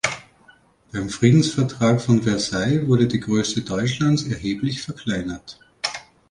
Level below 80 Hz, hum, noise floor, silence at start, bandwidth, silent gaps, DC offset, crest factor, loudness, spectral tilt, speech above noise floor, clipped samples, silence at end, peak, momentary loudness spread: -48 dBFS; none; -54 dBFS; 0.05 s; 11 kHz; none; under 0.1%; 18 dB; -21 LUFS; -5.5 dB/octave; 34 dB; under 0.1%; 0.3 s; -4 dBFS; 13 LU